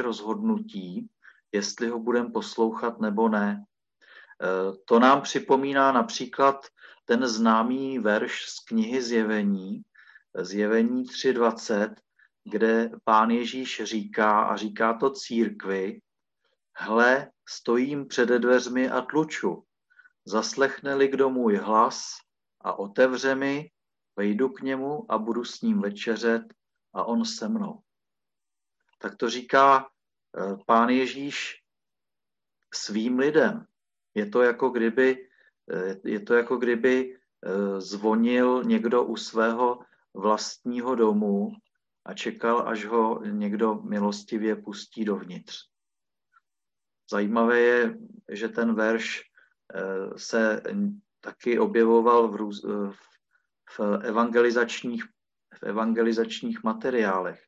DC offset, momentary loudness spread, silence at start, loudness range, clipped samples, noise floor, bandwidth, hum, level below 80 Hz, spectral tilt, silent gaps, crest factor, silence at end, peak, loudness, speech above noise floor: under 0.1%; 14 LU; 0 s; 4 LU; under 0.1%; under -90 dBFS; 8 kHz; none; -76 dBFS; -5 dB/octave; none; 20 dB; 0.15 s; -6 dBFS; -25 LUFS; over 65 dB